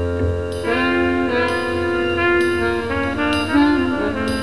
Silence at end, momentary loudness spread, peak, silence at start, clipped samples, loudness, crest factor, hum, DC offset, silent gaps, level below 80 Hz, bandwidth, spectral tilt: 0 s; 5 LU; -4 dBFS; 0 s; under 0.1%; -18 LUFS; 14 dB; none; 1%; none; -36 dBFS; 12.5 kHz; -6 dB/octave